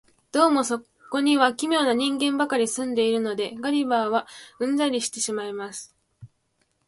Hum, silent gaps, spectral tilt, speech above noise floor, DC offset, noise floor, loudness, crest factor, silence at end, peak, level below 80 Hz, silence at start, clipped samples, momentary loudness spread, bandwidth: none; none; -2.5 dB/octave; 47 dB; under 0.1%; -71 dBFS; -24 LUFS; 20 dB; 0.6 s; -4 dBFS; -70 dBFS; 0.35 s; under 0.1%; 11 LU; 11.5 kHz